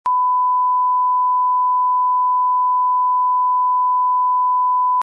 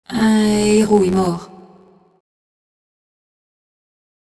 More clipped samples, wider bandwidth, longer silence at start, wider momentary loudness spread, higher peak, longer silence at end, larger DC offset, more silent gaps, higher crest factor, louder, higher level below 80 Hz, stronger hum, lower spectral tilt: neither; second, 1.7 kHz vs 11 kHz; about the same, 0.05 s vs 0.1 s; second, 0 LU vs 8 LU; second, -12 dBFS vs -2 dBFS; second, 0 s vs 2.95 s; neither; neither; second, 4 dB vs 18 dB; about the same, -16 LUFS vs -15 LUFS; second, -80 dBFS vs -48 dBFS; neither; second, 5.5 dB/octave vs -5.5 dB/octave